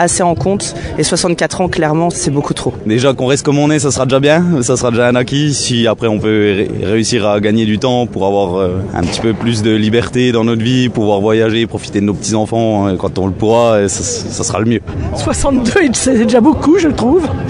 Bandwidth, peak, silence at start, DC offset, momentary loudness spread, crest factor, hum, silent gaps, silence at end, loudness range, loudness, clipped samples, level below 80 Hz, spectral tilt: 11 kHz; 0 dBFS; 0 s; under 0.1%; 6 LU; 12 dB; none; none; 0 s; 2 LU; -13 LUFS; under 0.1%; -34 dBFS; -5 dB/octave